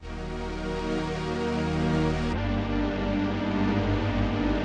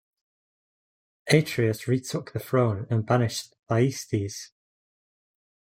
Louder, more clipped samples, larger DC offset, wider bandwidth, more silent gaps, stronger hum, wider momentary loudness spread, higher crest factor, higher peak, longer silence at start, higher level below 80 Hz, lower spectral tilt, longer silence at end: about the same, -28 LUFS vs -26 LUFS; neither; neither; second, 10 kHz vs 16 kHz; second, none vs 3.59-3.63 s; neither; second, 6 LU vs 12 LU; second, 12 dB vs 22 dB; second, -14 dBFS vs -4 dBFS; second, 0 s vs 1.25 s; first, -36 dBFS vs -64 dBFS; about the same, -7 dB/octave vs -6 dB/octave; second, 0 s vs 1.15 s